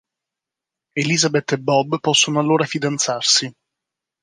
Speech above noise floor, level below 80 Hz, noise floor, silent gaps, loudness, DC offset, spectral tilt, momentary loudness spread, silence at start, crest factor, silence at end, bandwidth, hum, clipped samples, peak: 68 dB; -68 dBFS; -86 dBFS; none; -17 LUFS; under 0.1%; -3 dB/octave; 6 LU; 0.95 s; 18 dB; 0.7 s; 10.5 kHz; none; under 0.1%; -2 dBFS